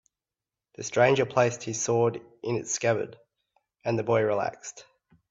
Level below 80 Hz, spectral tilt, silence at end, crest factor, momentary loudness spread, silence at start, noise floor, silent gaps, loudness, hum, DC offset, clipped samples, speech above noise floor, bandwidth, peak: -68 dBFS; -4.5 dB/octave; 0.5 s; 22 dB; 15 LU; 0.8 s; under -90 dBFS; none; -26 LUFS; none; under 0.1%; under 0.1%; over 64 dB; 8 kHz; -8 dBFS